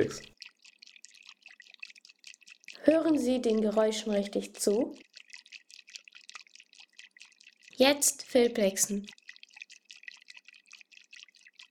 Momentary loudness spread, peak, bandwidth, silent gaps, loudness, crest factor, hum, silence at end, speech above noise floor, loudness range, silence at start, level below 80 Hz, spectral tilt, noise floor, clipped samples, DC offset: 26 LU; -8 dBFS; 18 kHz; none; -28 LUFS; 24 dB; none; 1.8 s; 30 dB; 6 LU; 0 s; -70 dBFS; -3 dB/octave; -58 dBFS; under 0.1%; under 0.1%